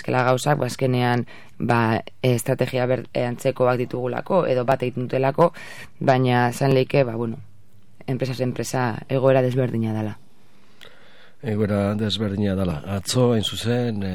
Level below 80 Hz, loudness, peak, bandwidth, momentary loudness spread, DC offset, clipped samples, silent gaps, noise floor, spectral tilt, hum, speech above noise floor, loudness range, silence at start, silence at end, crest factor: -56 dBFS; -22 LUFS; -2 dBFS; 16 kHz; 9 LU; 1%; under 0.1%; none; -56 dBFS; -6 dB/octave; none; 35 dB; 3 LU; 0.05 s; 0 s; 20 dB